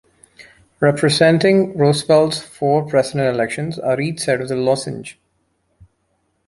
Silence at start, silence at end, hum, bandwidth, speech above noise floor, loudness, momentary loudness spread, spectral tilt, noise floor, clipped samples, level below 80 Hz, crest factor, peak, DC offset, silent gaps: 0.4 s; 1.35 s; none; 11.5 kHz; 50 dB; -17 LUFS; 9 LU; -5.5 dB/octave; -67 dBFS; under 0.1%; -56 dBFS; 16 dB; -2 dBFS; under 0.1%; none